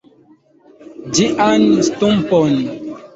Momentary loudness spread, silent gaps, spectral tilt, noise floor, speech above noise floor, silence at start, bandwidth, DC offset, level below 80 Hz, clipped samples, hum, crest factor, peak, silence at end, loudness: 12 LU; none; -5 dB/octave; -50 dBFS; 37 dB; 0.8 s; 8 kHz; under 0.1%; -50 dBFS; under 0.1%; none; 14 dB; -2 dBFS; 0.1 s; -15 LUFS